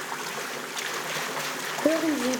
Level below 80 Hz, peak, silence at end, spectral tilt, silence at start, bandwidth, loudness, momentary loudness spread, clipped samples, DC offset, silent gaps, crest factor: -70 dBFS; -8 dBFS; 0 s; -2.5 dB/octave; 0 s; over 20 kHz; -28 LUFS; 7 LU; under 0.1%; under 0.1%; none; 20 dB